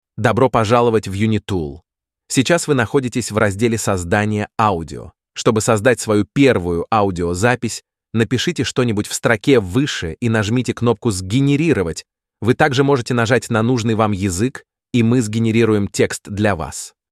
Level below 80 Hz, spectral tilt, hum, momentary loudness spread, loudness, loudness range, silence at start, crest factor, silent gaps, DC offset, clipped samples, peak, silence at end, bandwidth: -44 dBFS; -5.5 dB/octave; none; 8 LU; -17 LUFS; 1 LU; 0.15 s; 16 dB; none; under 0.1%; under 0.1%; -2 dBFS; 0.25 s; 14.5 kHz